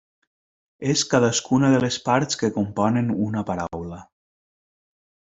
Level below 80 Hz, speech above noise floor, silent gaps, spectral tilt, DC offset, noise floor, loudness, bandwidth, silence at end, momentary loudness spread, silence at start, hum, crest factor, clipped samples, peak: -58 dBFS; over 68 dB; none; -5 dB/octave; under 0.1%; under -90 dBFS; -22 LUFS; 8 kHz; 1.3 s; 12 LU; 0.8 s; none; 20 dB; under 0.1%; -4 dBFS